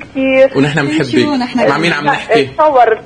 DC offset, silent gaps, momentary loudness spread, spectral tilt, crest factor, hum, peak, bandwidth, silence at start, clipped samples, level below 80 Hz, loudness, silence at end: under 0.1%; none; 4 LU; -6 dB/octave; 12 dB; none; 0 dBFS; 10 kHz; 0 s; under 0.1%; -46 dBFS; -11 LUFS; 0 s